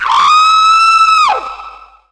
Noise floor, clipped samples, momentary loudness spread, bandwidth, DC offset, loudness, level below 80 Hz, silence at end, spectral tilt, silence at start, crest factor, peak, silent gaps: -33 dBFS; under 0.1%; 15 LU; 11 kHz; under 0.1%; -7 LUFS; -48 dBFS; 0.35 s; 1.5 dB/octave; 0 s; 10 dB; 0 dBFS; none